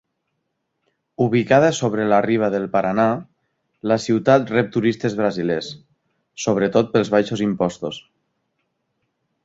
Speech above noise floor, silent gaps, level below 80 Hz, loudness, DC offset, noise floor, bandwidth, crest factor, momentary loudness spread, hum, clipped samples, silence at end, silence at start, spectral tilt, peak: 56 dB; none; -58 dBFS; -19 LUFS; under 0.1%; -74 dBFS; 8 kHz; 20 dB; 10 LU; none; under 0.1%; 1.45 s; 1.2 s; -6 dB/octave; -2 dBFS